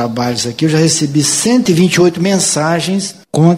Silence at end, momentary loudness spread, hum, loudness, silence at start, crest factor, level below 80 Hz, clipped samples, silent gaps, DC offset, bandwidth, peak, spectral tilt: 0 s; 6 LU; none; -12 LUFS; 0 s; 12 dB; -50 dBFS; under 0.1%; none; under 0.1%; 16 kHz; 0 dBFS; -4.5 dB/octave